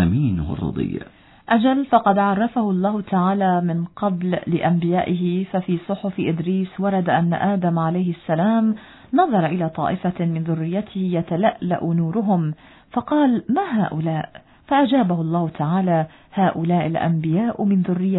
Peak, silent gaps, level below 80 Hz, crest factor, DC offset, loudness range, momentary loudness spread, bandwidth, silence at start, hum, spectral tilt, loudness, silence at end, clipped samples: -2 dBFS; none; -48 dBFS; 18 dB; under 0.1%; 2 LU; 7 LU; 4.1 kHz; 0 s; none; -12 dB/octave; -21 LUFS; 0 s; under 0.1%